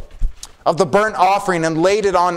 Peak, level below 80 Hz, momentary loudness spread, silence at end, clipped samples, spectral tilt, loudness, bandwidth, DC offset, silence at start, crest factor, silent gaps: -2 dBFS; -28 dBFS; 15 LU; 0 s; under 0.1%; -5 dB/octave; -16 LUFS; 15.5 kHz; under 0.1%; 0 s; 16 dB; none